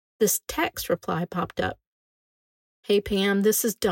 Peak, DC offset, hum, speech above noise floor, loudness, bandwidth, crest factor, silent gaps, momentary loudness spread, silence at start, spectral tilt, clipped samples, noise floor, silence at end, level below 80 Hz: -10 dBFS; under 0.1%; none; over 65 dB; -25 LUFS; 16.5 kHz; 16 dB; 1.87-2.83 s; 8 LU; 0.2 s; -3.5 dB/octave; under 0.1%; under -90 dBFS; 0 s; -52 dBFS